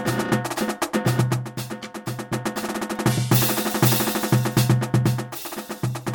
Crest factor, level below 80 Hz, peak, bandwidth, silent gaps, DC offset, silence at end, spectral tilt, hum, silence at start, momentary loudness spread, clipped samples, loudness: 18 dB; -52 dBFS; -4 dBFS; over 20 kHz; none; under 0.1%; 0 s; -5 dB/octave; none; 0 s; 13 LU; under 0.1%; -23 LUFS